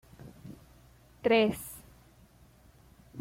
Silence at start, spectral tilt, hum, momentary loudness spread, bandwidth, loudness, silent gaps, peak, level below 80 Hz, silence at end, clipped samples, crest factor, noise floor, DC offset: 0.25 s; -5 dB/octave; none; 26 LU; 16.5 kHz; -28 LUFS; none; -14 dBFS; -62 dBFS; 0 s; under 0.1%; 20 dB; -59 dBFS; under 0.1%